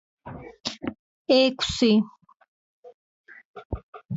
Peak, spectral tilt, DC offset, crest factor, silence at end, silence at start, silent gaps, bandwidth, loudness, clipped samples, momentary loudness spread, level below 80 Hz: -8 dBFS; -5 dB/octave; under 0.1%; 20 dB; 0 s; 0.25 s; 0.99-1.25 s, 2.48-2.83 s, 2.94-3.24 s, 3.45-3.54 s, 3.65-3.70 s, 3.83-3.93 s, 4.05-4.09 s; 8 kHz; -23 LUFS; under 0.1%; 22 LU; -48 dBFS